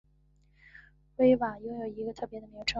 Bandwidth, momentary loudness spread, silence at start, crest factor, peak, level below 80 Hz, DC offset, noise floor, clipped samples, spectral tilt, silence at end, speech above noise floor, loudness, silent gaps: 8 kHz; 16 LU; 1.2 s; 20 dB; -12 dBFS; -58 dBFS; under 0.1%; -65 dBFS; under 0.1%; -5 dB/octave; 0 s; 35 dB; -30 LUFS; none